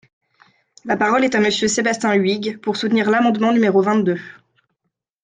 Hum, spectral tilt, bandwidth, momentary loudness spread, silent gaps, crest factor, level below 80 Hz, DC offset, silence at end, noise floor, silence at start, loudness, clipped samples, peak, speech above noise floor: none; -4.5 dB/octave; 9.6 kHz; 7 LU; none; 14 dB; -60 dBFS; under 0.1%; 0.9 s; -76 dBFS; 0.85 s; -17 LUFS; under 0.1%; -4 dBFS; 59 dB